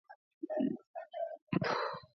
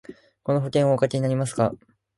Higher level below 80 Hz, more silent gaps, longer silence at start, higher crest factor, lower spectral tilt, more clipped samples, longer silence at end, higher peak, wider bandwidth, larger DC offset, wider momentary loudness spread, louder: second, -74 dBFS vs -60 dBFS; first, 0.15-0.41 s, 0.87-0.94 s, 1.42-1.47 s vs none; about the same, 0.1 s vs 0.1 s; about the same, 20 dB vs 18 dB; second, -5 dB/octave vs -7 dB/octave; neither; second, 0.1 s vs 0.4 s; second, -20 dBFS vs -6 dBFS; second, 6.4 kHz vs 11.5 kHz; neither; about the same, 11 LU vs 9 LU; second, -38 LUFS vs -23 LUFS